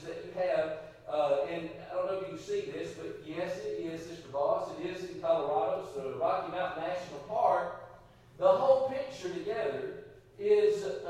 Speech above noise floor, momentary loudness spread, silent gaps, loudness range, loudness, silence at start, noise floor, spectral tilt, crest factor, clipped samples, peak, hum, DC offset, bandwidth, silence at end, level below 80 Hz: 24 dB; 13 LU; none; 5 LU; -33 LUFS; 0 s; -55 dBFS; -5.5 dB/octave; 20 dB; under 0.1%; -12 dBFS; none; under 0.1%; 11.5 kHz; 0 s; -66 dBFS